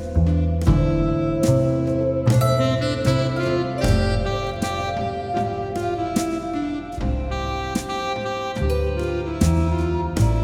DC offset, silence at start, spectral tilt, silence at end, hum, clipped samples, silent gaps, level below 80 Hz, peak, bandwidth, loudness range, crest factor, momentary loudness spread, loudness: under 0.1%; 0 s; -6.5 dB/octave; 0 s; none; under 0.1%; none; -28 dBFS; -4 dBFS; 16.5 kHz; 5 LU; 18 dB; 7 LU; -22 LUFS